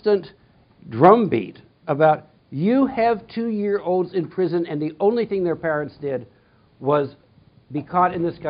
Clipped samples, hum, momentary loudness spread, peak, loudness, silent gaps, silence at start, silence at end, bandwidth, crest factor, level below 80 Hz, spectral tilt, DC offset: under 0.1%; none; 14 LU; 0 dBFS; -21 LUFS; none; 0.05 s; 0 s; 5.2 kHz; 22 dB; -60 dBFS; -6.5 dB/octave; under 0.1%